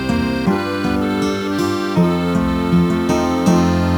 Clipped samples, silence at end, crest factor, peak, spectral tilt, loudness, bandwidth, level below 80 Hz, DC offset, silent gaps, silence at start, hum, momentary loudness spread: under 0.1%; 0 s; 14 dB; -2 dBFS; -6.5 dB/octave; -17 LUFS; 18 kHz; -34 dBFS; under 0.1%; none; 0 s; none; 4 LU